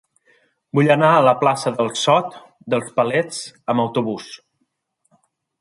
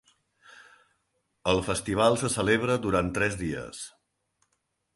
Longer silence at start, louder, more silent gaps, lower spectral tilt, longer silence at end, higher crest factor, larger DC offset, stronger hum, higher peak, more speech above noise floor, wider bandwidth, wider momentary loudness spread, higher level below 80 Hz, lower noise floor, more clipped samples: first, 0.75 s vs 0.55 s; first, -18 LUFS vs -26 LUFS; neither; about the same, -5 dB/octave vs -4.5 dB/octave; first, 1.25 s vs 1.05 s; about the same, 18 dB vs 22 dB; neither; neither; first, -2 dBFS vs -8 dBFS; about the same, 53 dB vs 51 dB; about the same, 11.5 kHz vs 12 kHz; about the same, 15 LU vs 13 LU; second, -68 dBFS vs -50 dBFS; second, -71 dBFS vs -77 dBFS; neither